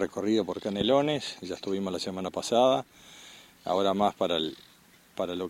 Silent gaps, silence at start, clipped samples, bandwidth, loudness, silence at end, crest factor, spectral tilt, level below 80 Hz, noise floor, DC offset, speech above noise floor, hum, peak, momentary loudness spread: none; 0 s; under 0.1%; 16.5 kHz; -28 LUFS; 0 s; 18 dB; -5 dB/octave; -64 dBFS; -55 dBFS; under 0.1%; 27 dB; none; -10 dBFS; 22 LU